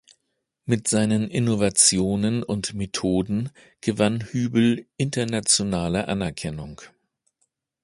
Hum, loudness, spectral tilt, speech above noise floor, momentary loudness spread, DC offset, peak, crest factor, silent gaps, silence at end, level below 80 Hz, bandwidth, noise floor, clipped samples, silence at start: none; -22 LUFS; -4 dB/octave; 54 dB; 12 LU; under 0.1%; -2 dBFS; 22 dB; none; 0.95 s; -50 dBFS; 11.5 kHz; -77 dBFS; under 0.1%; 0.65 s